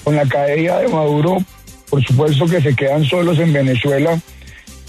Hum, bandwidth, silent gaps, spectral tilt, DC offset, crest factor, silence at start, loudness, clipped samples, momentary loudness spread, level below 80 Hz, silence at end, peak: none; 13.5 kHz; none; -7 dB/octave; under 0.1%; 12 dB; 0 s; -15 LUFS; under 0.1%; 5 LU; -44 dBFS; 0 s; -4 dBFS